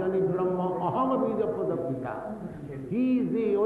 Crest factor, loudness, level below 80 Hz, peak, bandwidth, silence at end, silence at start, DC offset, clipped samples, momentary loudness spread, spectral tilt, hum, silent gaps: 12 dB; -28 LUFS; -60 dBFS; -14 dBFS; 4.4 kHz; 0 s; 0 s; under 0.1%; under 0.1%; 11 LU; -10 dB/octave; none; none